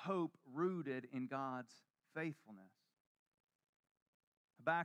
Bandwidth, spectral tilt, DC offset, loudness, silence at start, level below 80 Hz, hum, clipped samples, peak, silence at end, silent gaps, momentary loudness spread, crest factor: 11 kHz; -7.5 dB/octave; under 0.1%; -45 LUFS; 0 s; under -90 dBFS; none; under 0.1%; -24 dBFS; 0 s; 3.00-3.49 s, 3.55-3.59 s, 3.69-3.84 s, 3.91-3.95 s, 4.02-4.48 s; 18 LU; 22 dB